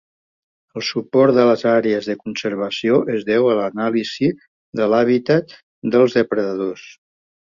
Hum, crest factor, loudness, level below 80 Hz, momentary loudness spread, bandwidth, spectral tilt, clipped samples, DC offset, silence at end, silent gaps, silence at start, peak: none; 18 dB; -18 LUFS; -62 dBFS; 11 LU; 7.4 kHz; -6 dB/octave; under 0.1%; under 0.1%; 0.6 s; 4.48-4.72 s, 5.63-5.82 s; 0.75 s; -2 dBFS